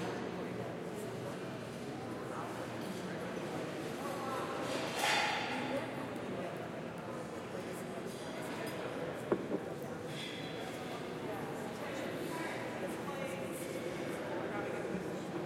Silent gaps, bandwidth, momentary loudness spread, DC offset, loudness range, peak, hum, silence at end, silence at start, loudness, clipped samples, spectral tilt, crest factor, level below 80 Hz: none; 16 kHz; 6 LU; under 0.1%; 5 LU; -18 dBFS; none; 0 s; 0 s; -40 LUFS; under 0.1%; -4.5 dB/octave; 22 dB; -72 dBFS